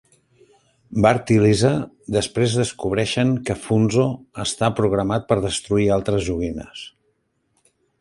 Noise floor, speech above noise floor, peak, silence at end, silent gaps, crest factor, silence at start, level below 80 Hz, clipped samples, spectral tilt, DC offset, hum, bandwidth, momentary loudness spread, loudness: -68 dBFS; 49 dB; -2 dBFS; 1.15 s; none; 18 dB; 0.9 s; -44 dBFS; under 0.1%; -5.5 dB/octave; under 0.1%; none; 11.5 kHz; 10 LU; -20 LUFS